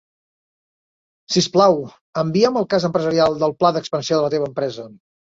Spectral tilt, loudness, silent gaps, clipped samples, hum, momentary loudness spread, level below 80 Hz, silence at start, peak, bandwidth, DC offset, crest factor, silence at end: -5 dB/octave; -19 LUFS; 2.01-2.13 s; under 0.1%; none; 9 LU; -58 dBFS; 1.3 s; -2 dBFS; 8 kHz; under 0.1%; 18 dB; 0.5 s